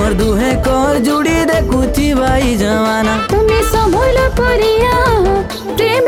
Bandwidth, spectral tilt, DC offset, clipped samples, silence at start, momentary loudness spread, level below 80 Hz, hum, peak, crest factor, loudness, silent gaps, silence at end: 18 kHz; -5.5 dB/octave; under 0.1%; under 0.1%; 0 s; 3 LU; -20 dBFS; none; -2 dBFS; 10 dB; -13 LUFS; none; 0 s